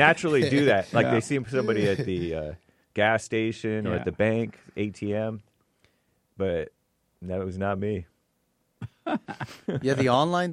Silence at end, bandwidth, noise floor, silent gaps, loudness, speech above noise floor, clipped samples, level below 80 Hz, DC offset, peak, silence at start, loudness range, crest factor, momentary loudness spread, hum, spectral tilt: 0 s; 13 kHz; -72 dBFS; none; -26 LUFS; 47 dB; under 0.1%; -56 dBFS; under 0.1%; -4 dBFS; 0 s; 8 LU; 22 dB; 14 LU; none; -6 dB/octave